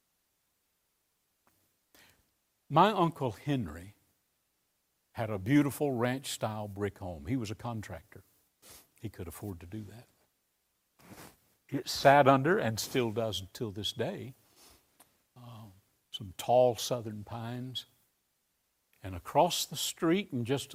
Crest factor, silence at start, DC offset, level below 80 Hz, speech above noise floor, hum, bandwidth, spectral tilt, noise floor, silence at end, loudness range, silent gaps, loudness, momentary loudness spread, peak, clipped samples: 26 dB; 2.7 s; under 0.1%; -64 dBFS; 47 dB; none; 16 kHz; -5 dB/octave; -78 dBFS; 0 s; 13 LU; none; -31 LUFS; 20 LU; -8 dBFS; under 0.1%